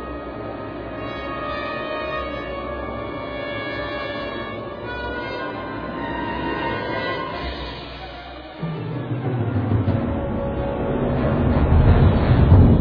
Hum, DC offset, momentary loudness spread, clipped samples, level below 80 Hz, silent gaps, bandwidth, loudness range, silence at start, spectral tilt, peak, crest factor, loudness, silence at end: none; under 0.1%; 15 LU; under 0.1%; -28 dBFS; none; 5.2 kHz; 8 LU; 0 s; -10 dB/octave; -2 dBFS; 20 dB; -23 LUFS; 0 s